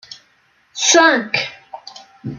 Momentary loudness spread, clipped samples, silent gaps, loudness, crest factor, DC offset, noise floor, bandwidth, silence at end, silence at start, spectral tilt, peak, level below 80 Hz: 24 LU; under 0.1%; none; -14 LUFS; 18 dB; under 0.1%; -58 dBFS; 10.5 kHz; 0 s; 0.1 s; -1.5 dB/octave; 0 dBFS; -66 dBFS